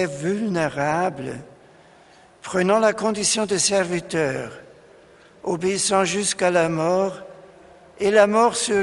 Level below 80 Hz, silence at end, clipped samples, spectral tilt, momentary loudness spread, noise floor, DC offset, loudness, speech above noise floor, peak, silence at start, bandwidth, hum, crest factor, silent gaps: -58 dBFS; 0 s; under 0.1%; -3.5 dB/octave; 14 LU; -51 dBFS; under 0.1%; -21 LUFS; 30 dB; -2 dBFS; 0 s; 11.5 kHz; none; 20 dB; none